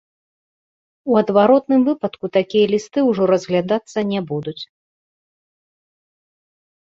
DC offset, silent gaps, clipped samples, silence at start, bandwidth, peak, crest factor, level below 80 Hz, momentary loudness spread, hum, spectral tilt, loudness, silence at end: under 0.1%; none; under 0.1%; 1.05 s; 7.8 kHz; -2 dBFS; 18 dB; -62 dBFS; 13 LU; none; -6.5 dB/octave; -18 LUFS; 2.3 s